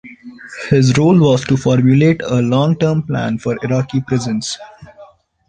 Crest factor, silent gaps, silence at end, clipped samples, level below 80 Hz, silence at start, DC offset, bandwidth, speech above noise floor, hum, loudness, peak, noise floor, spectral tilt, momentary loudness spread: 14 dB; none; 0.45 s; under 0.1%; -46 dBFS; 0.05 s; under 0.1%; 9.6 kHz; 29 dB; none; -14 LUFS; -2 dBFS; -43 dBFS; -6.5 dB/octave; 12 LU